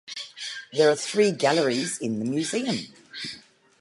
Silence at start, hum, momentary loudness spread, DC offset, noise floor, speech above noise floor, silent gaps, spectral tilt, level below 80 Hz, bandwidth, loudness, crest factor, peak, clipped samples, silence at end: 0.05 s; none; 15 LU; under 0.1%; -48 dBFS; 24 dB; none; -4 dB/octave; -72 dBFS; 11.5 kHz; -25 LUFS; 18 dB; -8 dBFS; under 0.1%; 0.4 s